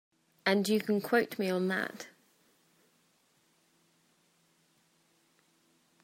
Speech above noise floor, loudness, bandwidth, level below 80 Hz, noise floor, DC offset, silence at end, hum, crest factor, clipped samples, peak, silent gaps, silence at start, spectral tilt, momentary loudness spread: 41 dB; -31 LUFS; 16 kHz; -84 dBFS; -71 dBFS; under 0.1%; 3.95 s; none; 24 dB; under 0.1%; -12 dBFS; none; 0.45 s; -5 dB/octave; 11 LU